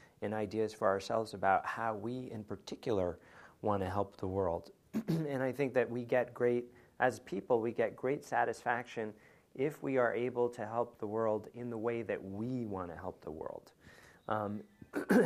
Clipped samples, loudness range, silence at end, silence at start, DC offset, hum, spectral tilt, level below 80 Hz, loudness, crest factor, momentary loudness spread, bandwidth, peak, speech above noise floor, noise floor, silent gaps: under 0.1%; 5 LU; 0 s; 0.2 s; under 0.1%; none; -6.5 dB/octave; -70 dBFS; -36 LUFS; 22 dB; 12 LU; 15 kHz; -14 dBFS; 24 dB; -60 dBFS; none